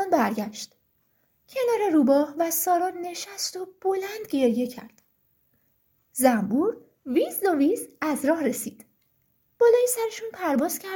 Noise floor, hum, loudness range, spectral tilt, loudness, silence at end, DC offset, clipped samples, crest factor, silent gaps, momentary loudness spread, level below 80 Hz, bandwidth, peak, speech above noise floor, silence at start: -69 dBFS; none; 3 LU; -4 dB/octave; -25 LUFS; 0 s; under 0.1%; under 0.1%; 18 dB; none; 13 LU; -70 dBFS; 17 kHz; -6 dBFS; 45 dB; 0 s